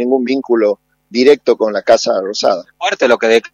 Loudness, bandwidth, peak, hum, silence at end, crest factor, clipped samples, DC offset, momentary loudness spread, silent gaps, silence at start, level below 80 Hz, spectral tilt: -13 LUFS; 9.4 kHz; 0 dBFS; none; 0.05 s; 14 dB; 0.1%; under 0.1%; 7 LU; none; 0 s; -62 dBFS; -3.5 dB/octave